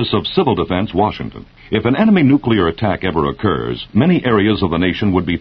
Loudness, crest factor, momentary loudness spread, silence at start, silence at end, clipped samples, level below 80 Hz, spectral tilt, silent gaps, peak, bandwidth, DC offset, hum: -15 LUFS; 14 dB; 7 LU; 0 s; 0 s; under 0.1%; -38 dBFS; -9.5 dB/octave; none; 0 dBFS; 5.8 kHz; under 0.1%; none